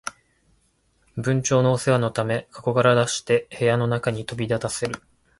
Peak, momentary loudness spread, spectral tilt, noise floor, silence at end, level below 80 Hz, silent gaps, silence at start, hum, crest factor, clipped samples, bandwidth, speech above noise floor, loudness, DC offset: -4 dBFS; 10 LU; -5 dB/octave; -65 dBFS; 0.45 s; -56 dBFS; none; 0.05 s; none; 18 dB; under 0.1%; 11.5 kHz; 43 dB; -22 LUFS; under 0.1%